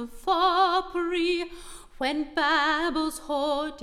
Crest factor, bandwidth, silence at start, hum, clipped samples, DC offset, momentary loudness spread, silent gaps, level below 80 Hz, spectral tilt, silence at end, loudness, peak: 16 dB; 15 kHz; 0 s; none; under 0.1%; under 0.1%; 9 LU; none; -50 dBFS; -2 dB/octave; 0 s; -25 LUFS; -10 dBFS